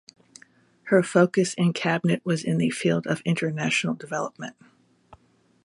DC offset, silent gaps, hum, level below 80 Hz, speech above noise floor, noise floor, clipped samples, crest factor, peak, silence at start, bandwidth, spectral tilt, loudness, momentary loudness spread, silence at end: under 0.1%; none; none; -68 dBFS; 36 dB; -60 dBFS; under 0.1%; 20 dB; -4 dBFS; 0.85 s; 11.5 kHz; -5.5 dB/octave; -24 LUFS; 10 LU; 0.5 s